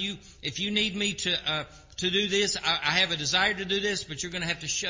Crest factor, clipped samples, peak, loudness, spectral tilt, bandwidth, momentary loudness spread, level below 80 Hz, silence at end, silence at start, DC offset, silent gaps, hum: 20 dB; under 0.1%; -8 dBFS; -26 LUFS; -2 dB/octave; 7.8 kHz; 9 LU; -54 dBFS; 0 s; 0 s; under 0.1%; none; none